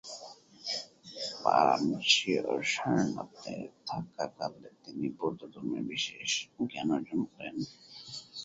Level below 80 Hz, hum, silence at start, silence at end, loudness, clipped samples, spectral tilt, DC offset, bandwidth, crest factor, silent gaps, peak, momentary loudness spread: -72 dBFS; none; 0.05 s; 0 s; -32 LUFS; under 0.1%; -3.5 dB/octave; under 0.1%; 8.2 kHz; 24 dB; none; -10 dBFS; 18 LU